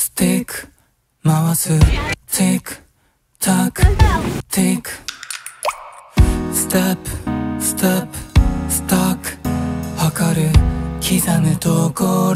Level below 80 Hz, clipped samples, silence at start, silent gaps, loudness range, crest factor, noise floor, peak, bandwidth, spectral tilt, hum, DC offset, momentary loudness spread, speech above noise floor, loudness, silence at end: -24 dBFS; under 0.1%; 0 s; none; 2 LU; 16 dB; -60 dBFS; 0 dBFS; 16.5 kHz; -5 dB/octave; none; under 0.1%; 9 LU; 44 dB; -17 LUFS; 0 s